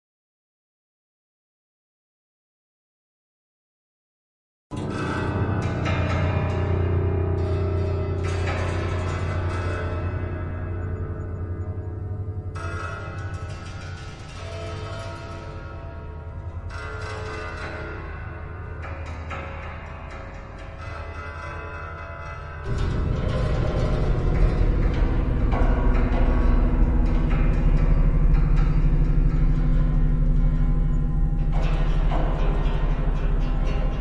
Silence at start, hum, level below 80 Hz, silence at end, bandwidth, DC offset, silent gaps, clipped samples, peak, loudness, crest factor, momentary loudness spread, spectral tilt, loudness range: 4.7 s; none; -26 dBFS; 0 s; 7.6 kHz; under 0.1%; none; under 0.1%; -8 dBFS; -26 LUFS; 16 dB; 13 LU; -8 dB/octave; 12 LU